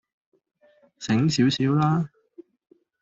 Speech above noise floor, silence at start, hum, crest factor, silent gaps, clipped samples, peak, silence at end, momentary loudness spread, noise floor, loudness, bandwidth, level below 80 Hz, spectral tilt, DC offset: 30 dB; 1 s; none; 16 dB; none; under 0.1%; -10 dBFS; 0.6 s; 12 LU; -51 dBFS; -23 LUFS; 8 kHz; -60 dBFS; -6 dB/octave; under 0.1%